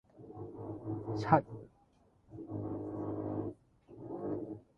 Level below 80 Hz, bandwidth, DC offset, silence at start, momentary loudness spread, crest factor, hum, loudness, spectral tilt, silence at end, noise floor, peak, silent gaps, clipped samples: -64 dBFS; 7.8 kHz; under 0.1%; 0.15 s; 22 LU; 28 dB; none; -37 LUFS; -9 dB/octave; 0.15 s; -68 dBFS; -10 dBFS; none; under 0.1%